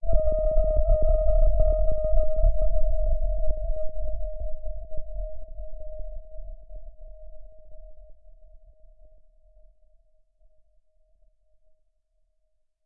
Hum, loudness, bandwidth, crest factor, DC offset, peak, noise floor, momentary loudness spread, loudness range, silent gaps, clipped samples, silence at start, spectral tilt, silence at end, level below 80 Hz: none; -28 LUFS; 1.4 kHz; 18 dB; under 0.1%; -6 dBFS; -69 dBFS; 22 LU; 23 LU; none; under 0.1%; 0 s; -14 dB/octave; 4.75 s; -28 dBFS